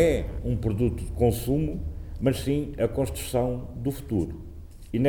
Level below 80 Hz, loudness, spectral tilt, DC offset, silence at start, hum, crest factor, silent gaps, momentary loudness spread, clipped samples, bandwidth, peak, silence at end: -36 dBFS; -28 LUFS; -7 dB/octave; under 0.1%; 0 s; none; 16 dB; none; 10 LU; under 0.1%; 19.5 kHz; -10 dBFS; 0 s